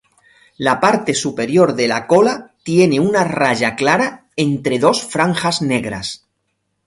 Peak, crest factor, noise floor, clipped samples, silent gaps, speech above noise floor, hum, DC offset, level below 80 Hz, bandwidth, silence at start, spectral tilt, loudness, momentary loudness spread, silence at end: 0 dBFS; 16 dB; -70 dBFS; under 0.1%; none; 55 dB; none; under 0.1%; -54 dBFS; 11.5 kHz; 0.6 s; -5 dB/octave; -16 LUFS; 7 LU; 0.7 s